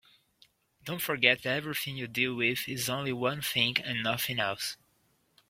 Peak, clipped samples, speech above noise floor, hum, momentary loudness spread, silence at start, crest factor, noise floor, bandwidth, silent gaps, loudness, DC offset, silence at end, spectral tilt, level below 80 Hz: -6 dBFS; under 0.1%; 40 dB; none; 11 LU; 0.85 s; 26 dB; -71 dBFS; 16.5 kHz; none; -29 LUFS; under 0.1%; 0.75 s; -3 dB/octave; -68 dBFS